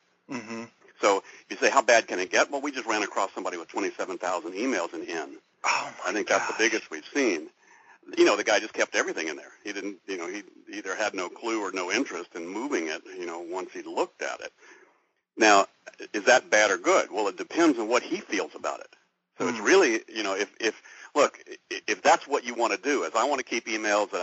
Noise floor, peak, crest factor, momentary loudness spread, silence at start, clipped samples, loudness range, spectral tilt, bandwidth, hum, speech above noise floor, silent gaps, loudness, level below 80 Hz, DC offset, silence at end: -68 dBFS; -4 dBFS; 24 dB; 15 LU; 0.3 s; under 0.1%; 7 LU; -0.5 dB/octave; 8 kHz; none; 41 dB; none; -26 LUFS; -80 dBFS; under 0.1%; 0 s